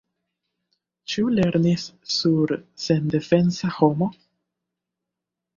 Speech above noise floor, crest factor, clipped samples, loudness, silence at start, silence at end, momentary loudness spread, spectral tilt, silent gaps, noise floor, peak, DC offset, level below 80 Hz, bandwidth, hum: 64 dB; 20 dB; under 0.1%; -22 LUFS; 1.1 s; 1.45 s; 8 LU; -6.5 dB/octave; none; -85 dBFS; -4 dBFS; under 0.1%; -56 dBFS; 7.4 kHz; none